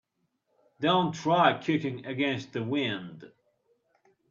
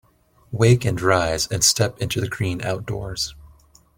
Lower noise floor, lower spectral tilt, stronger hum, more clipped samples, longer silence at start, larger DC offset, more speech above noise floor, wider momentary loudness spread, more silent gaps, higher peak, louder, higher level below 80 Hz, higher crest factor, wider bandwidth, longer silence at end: first, -77 dBFS vs -54 dBFS; first, -6 dB/octave vs -4 dB/octave; neither; neither; first, 0.8 s vs 0.5 s; neither; first, 49 dB vs 33 dB; about the same, 10 LU vs 11 LU; neither; second, -6 dBFS vs -2 dBFS; second, -28 LUFS vs -21 LUFS; second, -72 dBFS vs -44 dBFS; about the same, 24 dB vs 20 dB; second, 7.6 kHz vs 17 kHz; first, 1.05 s vs 0.5 s